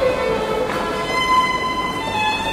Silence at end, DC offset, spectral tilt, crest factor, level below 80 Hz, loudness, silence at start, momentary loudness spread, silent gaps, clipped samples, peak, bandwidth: 0 s; under 0.1%; -3.5 dB/octave; 14 dB; -40 dBFS; -19 LUFS; 0 s; 5 LU; none; under 0.1%; -6 dBFS; 16 kHz